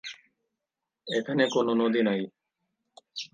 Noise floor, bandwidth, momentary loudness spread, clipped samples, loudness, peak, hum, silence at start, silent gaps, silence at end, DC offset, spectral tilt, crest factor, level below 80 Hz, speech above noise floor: -87 dBFS; 9.2 kHz; 17 LU; under 0.1%; -26 LUFS; -10 dBFS; none; 0.05 s; none; 0.05 s; under 0.1%; -5 dB/octave; 20 dB; -80 dBFS; 62 dB